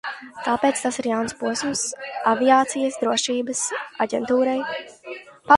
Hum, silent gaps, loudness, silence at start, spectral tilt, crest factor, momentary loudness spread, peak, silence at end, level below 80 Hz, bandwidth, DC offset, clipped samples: none; none; -22 LUFS; 0.05 s; -2.5 dB/octave; 22 dB; 15 LU; 0 dBFS; 0 s; -62 dBFS; 11.5 kHz; under 0.1%; under 0.1%